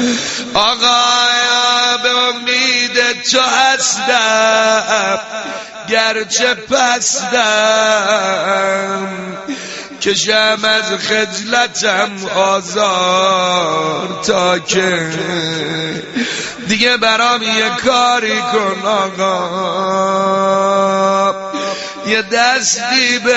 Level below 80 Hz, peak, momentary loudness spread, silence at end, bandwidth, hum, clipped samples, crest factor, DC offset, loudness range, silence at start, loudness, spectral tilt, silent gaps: -54 dBFS; 0 dBFS; 9 LU; 0 s; 8.2 kHz; none; under 0.1%; 14 dB; under 0.1%; 3 LU; 0 s; -13 LUFS; -2 dB/octave; none